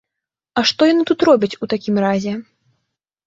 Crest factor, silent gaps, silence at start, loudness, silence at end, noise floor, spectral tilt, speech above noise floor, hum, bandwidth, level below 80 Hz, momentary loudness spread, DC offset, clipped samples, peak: 16 dB; none; 0.55 s; -17 LUFS; 0.85 s; -83 dBFS; -5 dB/octave; 67 dB; none; 7.8 kHz; -60 dBFS; 10 LU; under 0.1%; under 0.1%; -2 dBFS